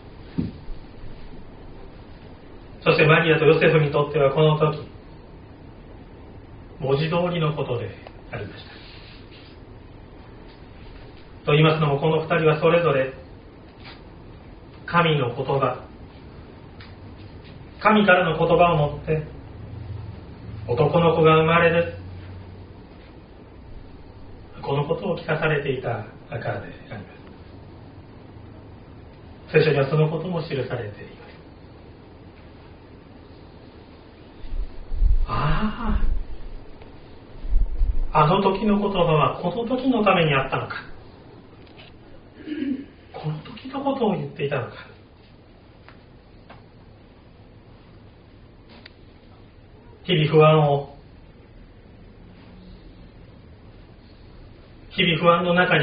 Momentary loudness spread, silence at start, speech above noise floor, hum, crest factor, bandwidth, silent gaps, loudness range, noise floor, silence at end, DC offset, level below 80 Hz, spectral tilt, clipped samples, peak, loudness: 27 LU; 0.05 s; 29 dB; none; 22 dB; 5 kHz; none; 13 LU; -49 dBFS; 0 s; under 0.1%; -34 dBFS; -5 dB/octave; under 0.1%; -2 dBFS; -21 LUFS